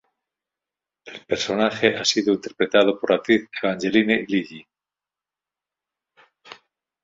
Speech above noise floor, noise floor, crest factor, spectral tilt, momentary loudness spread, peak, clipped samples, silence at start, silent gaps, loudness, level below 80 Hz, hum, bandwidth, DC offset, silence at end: 69 dB; -90 dBFS; 22 dB; -4 dB/octave; 8 LU; -2 dBFS; under 0.1%; 1.05 s; none; -21 LUFS; -62 dBFS; none; 7.8 kHz; under 0.1%; 0.5 s